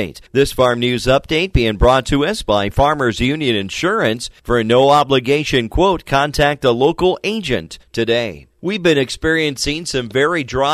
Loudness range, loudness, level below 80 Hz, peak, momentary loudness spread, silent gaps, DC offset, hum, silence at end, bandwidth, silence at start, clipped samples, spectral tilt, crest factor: 3 LU; -16 LUFS; -30 dBFS; -2 dBFS; 7 LU; none; under 0.1%; none; 0 s; 15 kHz; 0 s; under 0.1%; -5 dB/octave; 14 dB